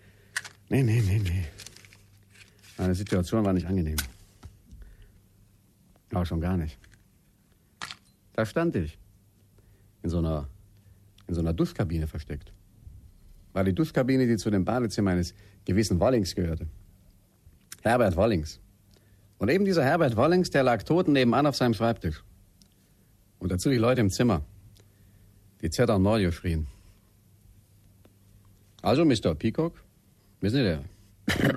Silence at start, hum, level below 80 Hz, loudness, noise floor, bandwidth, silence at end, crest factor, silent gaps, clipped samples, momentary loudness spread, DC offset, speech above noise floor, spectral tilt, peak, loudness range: 0.35 s; none; -44 dBFS; -27 LUFS; -62 dBFS; 14.5 kHz; 0 s; 18 dB; none; under 0.1%; 17 LU; under 0.1%; 37 dB; -6.5 dB/octave; -10 dBFS; 9 LU